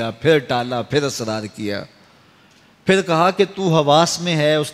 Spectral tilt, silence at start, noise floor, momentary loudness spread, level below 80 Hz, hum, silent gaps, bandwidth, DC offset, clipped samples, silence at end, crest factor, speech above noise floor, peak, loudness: -4.5 dB/octave; 0 s; -51 dBFS; 11 LU; -56 dBFS; none; none; 15 kHz; under 0.1%; under 0.1%; 0 s; 18 dB; 34 dB; -2 dBFS; -18 LUFS